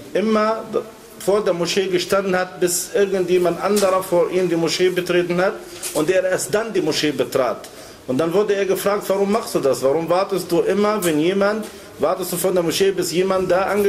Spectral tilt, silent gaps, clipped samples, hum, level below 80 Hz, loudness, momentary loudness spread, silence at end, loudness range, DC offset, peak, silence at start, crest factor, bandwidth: -4.5 dB/octave; none; under 0.1%; none; -54 dBFS; -19 LUFS; 6 LU; 0 s; 2 LU; under 0.1%; -6 dBFS; 0 s; 14 dB; 16 kHz